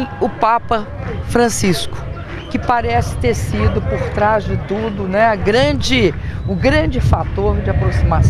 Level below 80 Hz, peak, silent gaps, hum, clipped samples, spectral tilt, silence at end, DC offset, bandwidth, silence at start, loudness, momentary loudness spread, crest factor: -24 dBFS; 0 dBFS; none; none; under 0.1%; -5.5 dB/octave; 0 s; under 0.1%; 14 kHz; 0 s; -16 LUFS; 8 LU; 16 dB